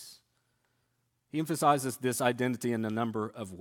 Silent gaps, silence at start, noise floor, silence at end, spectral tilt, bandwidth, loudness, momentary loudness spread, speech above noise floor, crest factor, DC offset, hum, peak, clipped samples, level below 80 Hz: none; 0 s; -77 dBFS; 0 s; -5 dB/octave; 17.5 kHz; -31 LUFS; 11 LU; 47 dB; 22 dB; under 0.1%; none; -10 dBFS; under 0.1%; -76 dBFS